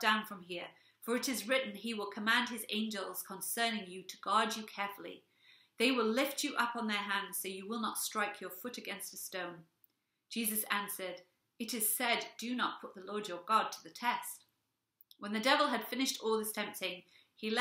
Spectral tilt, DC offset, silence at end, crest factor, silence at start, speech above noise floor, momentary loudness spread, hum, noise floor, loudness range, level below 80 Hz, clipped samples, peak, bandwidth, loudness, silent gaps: -2 dB/octave; under 0.1%; 0 s; 24 dB; 0 s; 48 dB; 13 LU; none; -84 dBFS; 4 LU; -90 dBFS; under 0.1%; -12 dBFS; 16 kHz; -36 LUFS; none